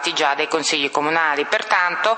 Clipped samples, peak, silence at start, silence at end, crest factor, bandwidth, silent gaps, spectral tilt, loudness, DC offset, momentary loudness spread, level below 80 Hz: under 0.1%; -2 dBFS; 0 s; 0 s; 18 dB; 8.8 kHz; none; -1.5 dB/octave; -18 LUFS; under 0.1%; 2 LU; -74 dBFS